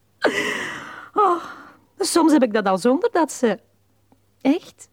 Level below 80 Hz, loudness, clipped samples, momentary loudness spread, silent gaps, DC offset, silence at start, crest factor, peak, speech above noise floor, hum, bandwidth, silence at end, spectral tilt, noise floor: -66 dBFS; -20 LUFS; under 0.1%; 11 LU; none; under 0.1%; 0.2 s; 16 dB; -6 dBFS; 41 dB; none; 16.5 kHz; 0.1 s; -4 dB/octave; -60 dBFS